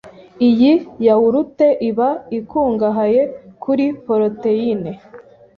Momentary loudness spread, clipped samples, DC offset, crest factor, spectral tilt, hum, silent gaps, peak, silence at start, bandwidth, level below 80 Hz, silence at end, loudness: 11 LU; under 0.1%; under 0.1%; 14 dB; -9 dB/octave; none; none; -2 dBFS; 0.05 s; 5.4 kHz; -54 dBFS; 0.35 s; -16 LUFS